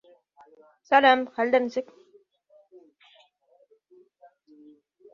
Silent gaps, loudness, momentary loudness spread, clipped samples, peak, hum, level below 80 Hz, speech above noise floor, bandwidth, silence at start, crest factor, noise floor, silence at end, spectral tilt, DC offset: none; -22 LUFS; 15 LU; under 0.1%; -4 dBFS; none; -78 dBFS; 42 dB; 7 kHz; 0.9 s; 24 dB; -63 dBFS; 3.3 s; -3.5 dB/octave; under 0.1%